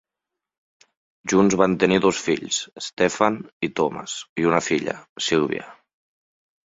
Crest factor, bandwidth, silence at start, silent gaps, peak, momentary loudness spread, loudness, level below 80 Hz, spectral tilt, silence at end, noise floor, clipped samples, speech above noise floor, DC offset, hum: 22 dB; 8 kHz; 1.25 s; 2.93-2.97 s, 3.53-3.60 s, 4.29-4.36 s, 5.09-5.16 s; -2 dBFS; 12 LU; -22 LUFS; -58 dBFS; -4 dB/octave; 0.9 s; -86 dBFS; under 0.1%; 64 dB; under 0.1%; none